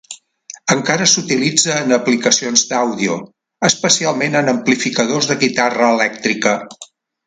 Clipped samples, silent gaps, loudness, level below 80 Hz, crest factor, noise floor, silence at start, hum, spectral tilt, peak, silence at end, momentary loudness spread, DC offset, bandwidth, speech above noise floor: under 0.1%; none; -15 LUFS; -60 dBFS; 16 dB; -39 dBFS; 0.1 s; none; -2.5 dB/octave; 0 dBFS; 0.45 s; 9 LU; under 0.1%; 10.5 kHz; 24 dB